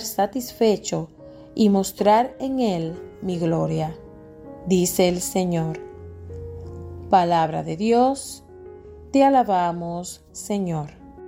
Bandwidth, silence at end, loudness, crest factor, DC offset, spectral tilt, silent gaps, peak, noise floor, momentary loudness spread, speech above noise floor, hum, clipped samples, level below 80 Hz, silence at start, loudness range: 16.5 kHz; 0 s; -22 LUFS; 18 dB; under 0.1%; -5.5 dB/octave; none; -4 dBFS; -42 dBFS; 19 LU; 21 dB; none; under 0.1%; -52 dBFS; 0 s; 3 LU